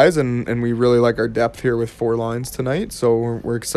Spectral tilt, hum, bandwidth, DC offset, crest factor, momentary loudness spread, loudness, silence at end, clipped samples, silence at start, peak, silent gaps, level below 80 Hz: -6 dB/octave; none; 14 kHz; under 0.1%; 18 dB; 7 LU; -19 LUFS; 0 s; under 0.1%; 0 s; 0 dBFS; none; -44 dBFS